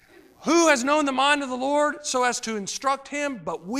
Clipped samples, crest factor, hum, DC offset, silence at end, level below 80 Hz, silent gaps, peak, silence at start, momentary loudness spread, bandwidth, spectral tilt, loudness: under 0.1%; 20 dB; none; under 0.1%; 0 s; -64 dBFS; none; -4 dBFS; 0.4 s; 10 LU; 15 kHz; -2 dB/octave; -23 LUFS